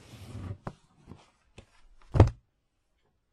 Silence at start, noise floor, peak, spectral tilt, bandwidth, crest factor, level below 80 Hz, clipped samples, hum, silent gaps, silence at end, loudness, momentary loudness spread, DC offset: 0.35 s; -75 dBFS; 0 dBFS; -8.5 dB/octave; 9.6 kHz; 32 dB; -40 dBFS; under 0.1%; none; none; 1 s; -27 LUFS; 22 LU; under 0.1%